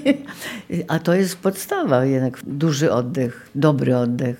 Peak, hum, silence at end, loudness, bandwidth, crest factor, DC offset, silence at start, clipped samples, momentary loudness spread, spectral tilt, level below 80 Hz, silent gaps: -2 dBFS; none; 0.05 s; -20 LUFS; 17 kHz; 18 dB; under 0.1%; 0 s; under 0.1%; 8 LU; -6.5 dB/octave; -60 dBFS; none